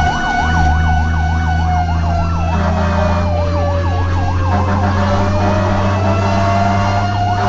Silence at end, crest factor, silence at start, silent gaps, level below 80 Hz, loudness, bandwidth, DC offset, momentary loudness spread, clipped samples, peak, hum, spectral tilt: 0 s; 10 dB; 0 s; none; -22 dBFS; -15 LUFS; 7.6 kHz; under 0.1%; 3 LU; under 0.1%; -4 dBFS; none; -7 dB/octave